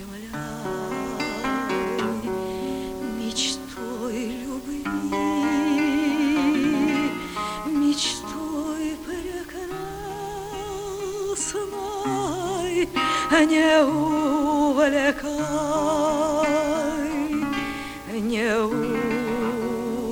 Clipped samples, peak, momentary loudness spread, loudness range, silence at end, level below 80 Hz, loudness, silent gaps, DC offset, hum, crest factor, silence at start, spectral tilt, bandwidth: under 0.1%; -6 dBFS; 12 LU; 8 LU; 0 s; -48 dBFS; -24 LUFS; none; under 0.1%; none; 18 dB; 0 s; -4 dB/octave; over 20 kHz